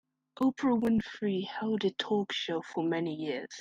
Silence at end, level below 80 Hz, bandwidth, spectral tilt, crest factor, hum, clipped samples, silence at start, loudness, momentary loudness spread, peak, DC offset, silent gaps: 0 s; -66 dBFS; 9.2 kHz; -6 dB/octave; 14 dB; none; under 0.1%; 0.4 s; -32 LUFS; 6 LU; -16 dBFS; under 0.1%; none